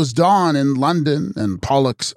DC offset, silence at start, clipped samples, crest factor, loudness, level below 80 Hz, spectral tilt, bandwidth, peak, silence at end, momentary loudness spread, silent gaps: under 0.1%; 0 s; under 0.1%; 14 dB; -17 LUFS; -48 dBFS; -6 dB/octave; 14 kHz; -4 dBFS; 0.05 s; 7 LU; none